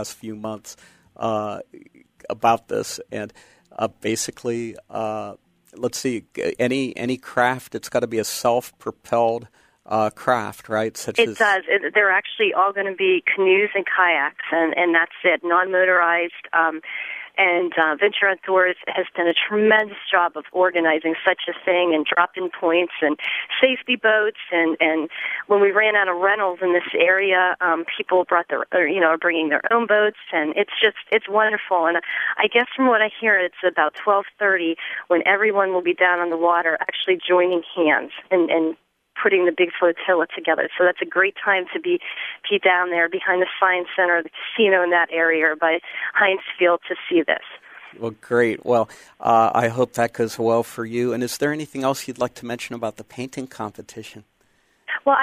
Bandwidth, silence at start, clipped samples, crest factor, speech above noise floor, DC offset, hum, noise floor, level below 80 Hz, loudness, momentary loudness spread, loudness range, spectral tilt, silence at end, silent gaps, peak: 15.5 kHz; 0 s; under 0.1%; 20 dB; 42 dB; under 0.1%; none; -62 dBFS; -68 dBFS; -20 LUFS; 12 LU; 7 LU; -4 dB/octave; 0 s; none; 0 dBFS